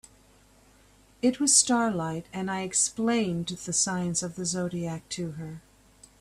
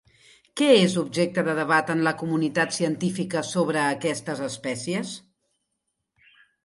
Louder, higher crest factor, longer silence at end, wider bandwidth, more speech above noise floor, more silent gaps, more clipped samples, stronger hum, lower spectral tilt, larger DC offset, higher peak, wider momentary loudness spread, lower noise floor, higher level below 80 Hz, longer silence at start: about the same, -26 LUFS vs -24 LUFS; about the same, 22 dB vs 20 dB; second, 0.6 s vs 1.45 s; first, 14.5 kHz vs 11.5 kHz; second, 31 dB vs 55 dB; neither; neither; neither; second, -3 dB/octave vs -4.5 dB/octave; neither; about the same, -6 dBFS vs -6 dBFS; first, 15 LU vs 11 LU; second, -59 dBFS vs -79 dBFS; first, -60 dBFS vs -70 dBFS; first, 1.25 s vs 0.55 s